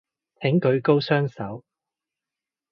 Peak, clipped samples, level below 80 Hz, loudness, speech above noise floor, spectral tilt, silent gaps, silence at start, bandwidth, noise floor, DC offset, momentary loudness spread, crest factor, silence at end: -6 dBFS; under 0.1%; -64 dBFS; -22 LUFS; 67 dB; -9 dB/octave; none; 0.4 s; 6 kHz; -89 dBFS; under 0.1%; 15 LU; 20 dB; 1.15 s